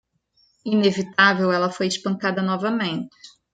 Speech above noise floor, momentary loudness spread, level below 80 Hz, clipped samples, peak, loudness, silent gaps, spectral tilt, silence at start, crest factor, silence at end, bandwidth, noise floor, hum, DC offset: 43 dB; 11 LU; -68 dBFS; under 0.1%; -2 dBFS; -21 LUFS; none; -5 dB/octave; 0.65 s; 20 dB; 0.25 s; 9.2 kHz; -64 dBFS; none; under 0.1%